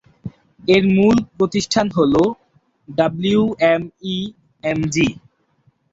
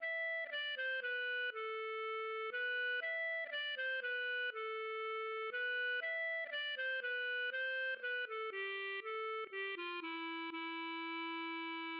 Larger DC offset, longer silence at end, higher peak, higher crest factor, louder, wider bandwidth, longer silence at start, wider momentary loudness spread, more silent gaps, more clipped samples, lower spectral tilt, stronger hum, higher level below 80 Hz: neither; first, 0.8 s vs 0 s; first, -2 dBFS vs -32 dBFS; first, 16 dB vs 8 dB; first, -18 LUFS vs -40 LUFS; first, 8 kHz vs 5.6 kHz; first, 0.25 s vs 0 s; first, 14 LU vs 5 LU; neither; neither; first, -5.5 dB/octave vs 4.5 dB/octave; neither; first, -48 dBFS vs under -90 dBFS